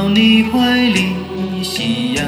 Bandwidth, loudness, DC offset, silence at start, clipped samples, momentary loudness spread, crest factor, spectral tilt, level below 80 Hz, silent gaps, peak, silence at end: 15 kHz; -14 LUFS; under 0.1%; 0 s; under 0.1%; 10 LU; 14 dB; -4.5 dB/octave; -42 dBFS; none; -2 dBFS; 0 s